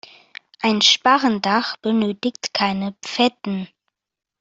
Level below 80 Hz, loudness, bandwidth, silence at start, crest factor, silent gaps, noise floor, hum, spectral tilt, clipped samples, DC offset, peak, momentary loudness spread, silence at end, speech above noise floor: -64 dBFS; -19 LUFS; 7.8 kHz; 0.6 s; 20 dB; none; -86 dBFS; none; -3.5 dB/octave; under 0.1%; under 0.1%; -2 dBFS; 14 LU; 0.75 s; 67 dB